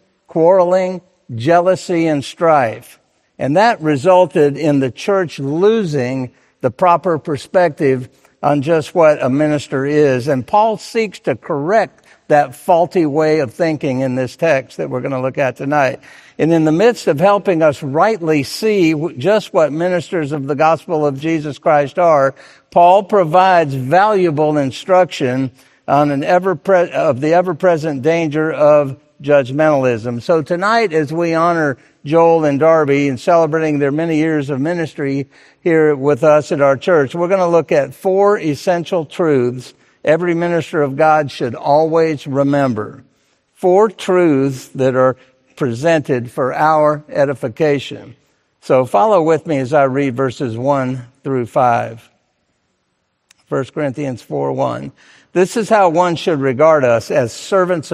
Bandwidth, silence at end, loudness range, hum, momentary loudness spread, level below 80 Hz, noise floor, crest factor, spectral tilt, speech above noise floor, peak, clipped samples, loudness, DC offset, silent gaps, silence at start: 14 kHz; 0 s; 3 LU; none; 9 LU; -60 dBFS; -67 dBFS; 14 dB; -6.5 dB/octave; 53 dB; 0 dBFS; under 0.1%; -15 LUFS; under 0.1%; none; 0.35 s